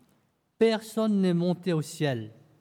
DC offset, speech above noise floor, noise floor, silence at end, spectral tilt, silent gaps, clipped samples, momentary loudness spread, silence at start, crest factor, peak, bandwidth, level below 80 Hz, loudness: under 0.1%; 43 dB; -69 dBFS; 0.3 s; -6.5 dB/octave; none; under 0.1%; 6 LU; 0.6 s; 16 dB; -12 dBFS; 15.5 kHz; -76 dBFS; -27 LUFS